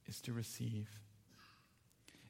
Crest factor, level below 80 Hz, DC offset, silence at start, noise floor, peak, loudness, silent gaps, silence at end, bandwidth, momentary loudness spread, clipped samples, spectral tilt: 16 dB; -78 dBFS; under 0.1%; 0.05 s; -72 dBFS; -32 dBFS; -46 LUFS; none; 0 s; 16.5 kHz; 21 LU; under 0.1%; -5 dB/octave